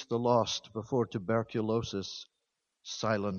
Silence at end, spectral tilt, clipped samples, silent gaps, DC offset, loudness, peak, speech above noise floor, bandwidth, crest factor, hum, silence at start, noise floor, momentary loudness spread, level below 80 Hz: 0 s; -5.5 dB/octave; under 0.1%; none; under 0.1%; -32 LUFS; -14 dBFS; 52 dB; 7.2 kHz; 18 dB; none; 0 s; -84 dBFS; 14 LU; -66 dBFS